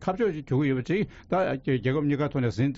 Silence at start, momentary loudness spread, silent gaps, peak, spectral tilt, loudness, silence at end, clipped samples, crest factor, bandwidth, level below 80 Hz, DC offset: 0 s; 3 LU; none; -14 dBFS; -7 dB/octave; -27 LUFS; 0 s; under 0.1%; 12 dB; 7.6 kHz; -52 dBFS; under 0.1%